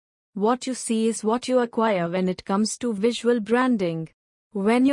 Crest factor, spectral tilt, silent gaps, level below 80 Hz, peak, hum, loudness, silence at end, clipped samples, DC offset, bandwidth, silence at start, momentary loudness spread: 14 dB; -5 dB/octave; 4.13-4.51 s; -66 dBFS; -8 dBFS; none; -23 LUFS; 0 s; under 0.1%; under 0.1%; 11 kHz; 0.35 s; 6 LU